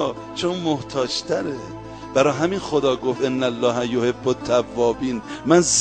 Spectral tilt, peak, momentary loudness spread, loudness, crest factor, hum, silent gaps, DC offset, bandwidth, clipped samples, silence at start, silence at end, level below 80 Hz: -4 dB/octave; -4 dBFS; 8 LU; -21 LUFS; 18 dB; none; none; under 0.1%; 9.8 kHz; under 0.1%; 0 s; 0 s; -50 dBFS